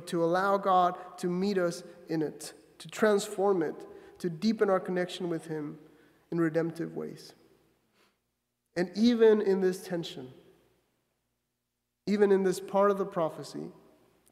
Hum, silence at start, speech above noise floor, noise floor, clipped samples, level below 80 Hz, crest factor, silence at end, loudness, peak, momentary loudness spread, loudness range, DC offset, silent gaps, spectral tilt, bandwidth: 60 Hz at -55 dBFS; 0 s; 55 dB; -83 dBFS; under 0.1%; -76 dBFS; 20 dB; 0.6 s; -29 LUFS; -10 dBFS; 18 LU; 5 LU; under 0.1%; none; -6 dB/octave; 15 kHz